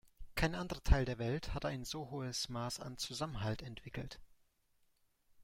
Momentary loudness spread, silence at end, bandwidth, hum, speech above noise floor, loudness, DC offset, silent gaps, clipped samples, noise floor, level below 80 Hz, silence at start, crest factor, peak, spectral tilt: 13 LU; 0 s; 16 kHz; none; 37 dB; -40 LUFS; under 0.1%; none; under 0.1%; -75 dBFS; -46 dBFS; 0.05 s; 26 dB; -14 dBFS; -5 dB/octave